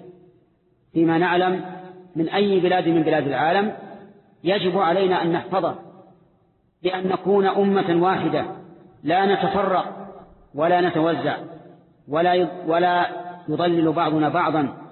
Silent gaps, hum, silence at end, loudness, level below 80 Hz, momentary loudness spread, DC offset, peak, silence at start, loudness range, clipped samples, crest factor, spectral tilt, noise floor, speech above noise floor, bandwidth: none; none; 0 s; -21 LUFS; -62 dBFS; 14 LU; under 0.1%; -8 dBFS; 0 s; 2 LU; under 0.1%; 14 dB; -11 dB/octave; -62 dBFS; 42 dB; 4.3 kHz